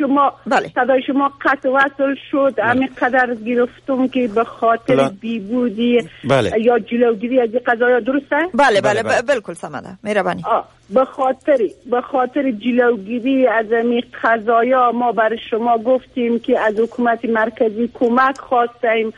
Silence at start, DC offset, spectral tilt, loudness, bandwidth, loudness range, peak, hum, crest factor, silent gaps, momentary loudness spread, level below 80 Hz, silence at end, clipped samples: 0 s; under 0.1%; -5.5 dB/octave; -17 LUFS; 11.5 kHz; 2 LU; -2 dBFS; none; 14 dB; none; 5 LU; -54 dBFS; 0.05 s; under 0.1%